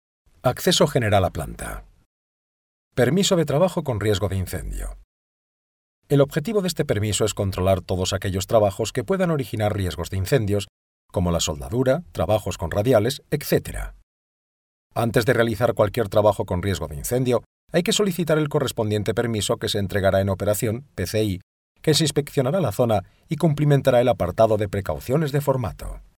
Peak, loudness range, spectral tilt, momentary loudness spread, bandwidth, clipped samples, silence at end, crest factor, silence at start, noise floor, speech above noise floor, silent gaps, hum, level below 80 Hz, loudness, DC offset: -4 dBFS; 3 LU; -5.5 dB/octave; 9 LU; 19.5 kHz; under 0.1%; 0.15 s; 18 dB; 0.45 s; under -90 dBFS; over 69 dB; 2.05-2.91 s, 5.04-6.02 s, 10.69-11.09 s, 14.03-14.90 s, 17.46-17.68 s, 21.43-21.75 s; none; -42 dBFS; -22 LUFS; under 0.1%